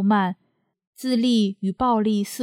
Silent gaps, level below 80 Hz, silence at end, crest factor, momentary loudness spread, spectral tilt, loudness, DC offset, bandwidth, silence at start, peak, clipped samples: 0.87-0.93 s; -54 dBFS; 0 s; 14 dB; 9 LU; -6 dB/octave; -22 LUFS; under 0.1%; 16 kHz; 0 s; -8 dBFS; under 0.1%